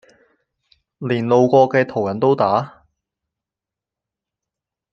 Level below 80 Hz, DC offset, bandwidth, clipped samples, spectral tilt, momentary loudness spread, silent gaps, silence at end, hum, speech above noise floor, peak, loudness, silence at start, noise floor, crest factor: -64 dBFS; under 0.1%; 6.8 kHz; under 0.1%; -7.5 dB/octave; 11 LU; none; 2.25 s; none; 71 dB; -2 dBFS; -17 LUFS; 1 s; -87 dBFS; 20 dB